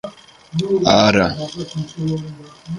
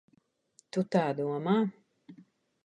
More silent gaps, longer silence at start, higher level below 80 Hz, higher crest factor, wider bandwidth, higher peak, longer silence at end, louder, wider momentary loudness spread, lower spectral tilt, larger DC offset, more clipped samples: neither; second, 0.05 s vs 0.75 s; first, -46 dBFS vs -78 dBFS; about the same, 20 dB vs 20 dB; about the same, 11 kHz vs 10 kHz; first, 0 dBFS vs -14 dBFS; second, 0 s vs 0.5 s; first, -18 LUFS vs -31 LUFS; first, 21 LU vs 7 LU; second, -5 dB/octave vs -7.5 dB/octave; neither; neither